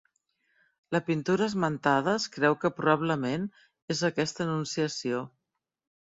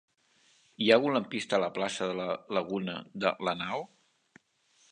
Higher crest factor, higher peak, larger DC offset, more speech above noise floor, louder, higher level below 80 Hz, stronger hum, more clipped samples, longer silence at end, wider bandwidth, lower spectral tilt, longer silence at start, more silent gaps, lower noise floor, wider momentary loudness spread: about the same, 20 dB vs 24 dB; about the same, -8 dBFS vs -8 dBFS; neither; first, 47 dB vs 38 dB; about the same, -28 LUFS vs -30 LUFS; first, -68 dBFS vs -74 dBFS; neither; neither; second, 0.75 s vs 1.05 s; second, 8 kHz vs 10 kHz; about the same, -5 dB/octave vs -4.5 dB/octave; about the same, 0.9 s vs 0.8 s; first, 3.82-3.88 s vs none; first, -75 dBFS vs -68 dBFS; second, 8 LU vs 11 LU